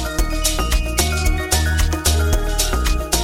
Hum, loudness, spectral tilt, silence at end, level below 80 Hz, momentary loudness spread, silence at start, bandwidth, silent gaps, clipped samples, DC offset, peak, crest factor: none; -19 LUFS; -3.5 dB/octave; 0 s; -20 dBFS; 3 LU; 0 s; 17 kHz; none; under 0.1%; under 0.1%; -2 dBFS; 16 dB